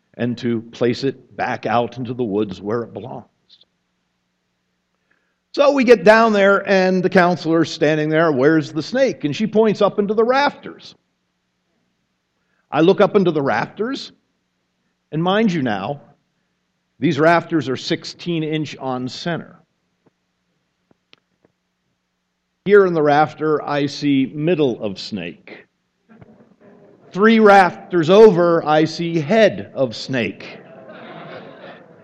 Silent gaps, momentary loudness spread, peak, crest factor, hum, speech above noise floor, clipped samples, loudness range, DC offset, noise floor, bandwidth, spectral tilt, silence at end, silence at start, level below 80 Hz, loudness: none; 17 LU; 0 dBFS; 18 dB; none; 55 dB; under 0.1%; 11 LU; under 0.1%; -72 dBFS; 8.8 kHz; -6.5 dB/octave; 0.3 s; 0.15 s; -62 dBFS; -17 LUFS